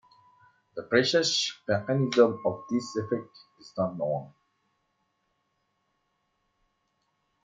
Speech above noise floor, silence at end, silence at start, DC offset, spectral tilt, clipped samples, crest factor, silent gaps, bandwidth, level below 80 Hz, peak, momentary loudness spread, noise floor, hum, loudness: 49 dB; 3.15 s; 0.75 s; under 0.1%; -4.5 dB/octave; under 0.1%; 22 dB; none; 9.4 kHz; -74 dBFS; -8 dBFS; 12 LU; -76 dBFS; none; -27 LUFS